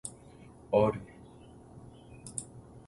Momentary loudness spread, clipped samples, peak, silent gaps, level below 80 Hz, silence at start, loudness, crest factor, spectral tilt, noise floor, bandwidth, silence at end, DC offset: 26 LU; under 0.1%; -14 dBFS; none; -60 dBFS; 0.05 s; -32 LUFS; 22 dB; -6 dB/octave; -53 dBFS; 11.5 kHz; 0.1 s; under 0.1%